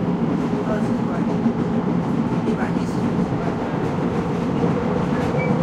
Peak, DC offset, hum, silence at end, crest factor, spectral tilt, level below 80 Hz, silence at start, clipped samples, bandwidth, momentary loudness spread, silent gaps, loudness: -6 dBFS; under 0.1%; none; 0 s; 14 dB; -8 dB/octave; -44 dBFS; 0 s; under 0.1%; 10.5 kHz; 2 LU; none; -22 LUFS